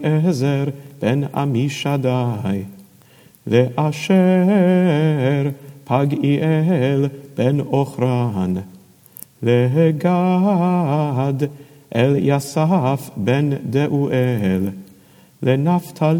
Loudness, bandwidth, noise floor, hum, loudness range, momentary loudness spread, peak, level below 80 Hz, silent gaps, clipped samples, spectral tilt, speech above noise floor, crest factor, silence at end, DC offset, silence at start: -18 LUFS; 17 kHz; -49 dBFS; none; 3 LU; 9 LU; -2 dBFS; -64 dBFS; none; under 0.1%; -7.5 dB/octave; 32 dB; 16 dB; 0 s; under 0.1%; 0 s